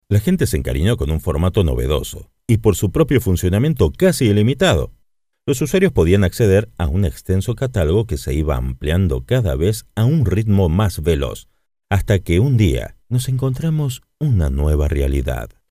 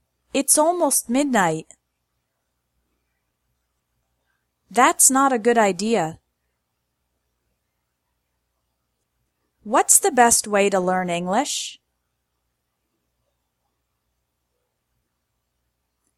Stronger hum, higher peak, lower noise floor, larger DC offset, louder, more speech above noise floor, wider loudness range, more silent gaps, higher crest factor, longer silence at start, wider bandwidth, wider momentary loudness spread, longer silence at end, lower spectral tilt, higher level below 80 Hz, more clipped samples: second, none vs 60 Hz at -55 dBFS; about the same, 0 dBFS vs 0 dBFS; second, -64 dBFS vs -76 dBFS; neither; about the same, -18 LUFS vs -18 LUFS; second, 48 dB vs 57 dB; second, 3 LU vs 12 LU; neither; second, 16 dB vs 24 dB; second, 0.1 s vs 0.35 s; about the same, 16 kHz vs 16 kHz; second, 7 LU vs 12 LU; second, 0.25 s vs 4.45 s; first, -6.5 dB/octave vs -2.5 dB/octave; first, -28 dBFS vs -64 dBFS; neither